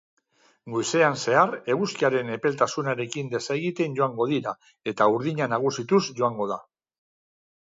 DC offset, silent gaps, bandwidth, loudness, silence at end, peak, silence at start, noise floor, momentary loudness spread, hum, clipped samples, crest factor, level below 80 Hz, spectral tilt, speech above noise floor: under 0.1%; none; 7.8 kHz; -25 LUFS; 1.15 s; -6 dBFS; 0.65 s; -62 dBFS; 9 LU; none; under 0.1%; 20 dB; -72 dBFS; -5 dB/octave; 38 dB